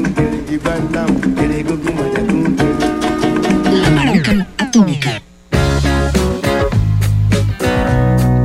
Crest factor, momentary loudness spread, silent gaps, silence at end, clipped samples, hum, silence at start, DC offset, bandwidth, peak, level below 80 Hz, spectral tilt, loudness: 14 dB; 5 LU; none; 0 s; under 0.1%; none; 0 s; under 0.1%; 16 kHz; 0 dBFS; -24 dBFS; -6.5 dB/octave; -15 LUFS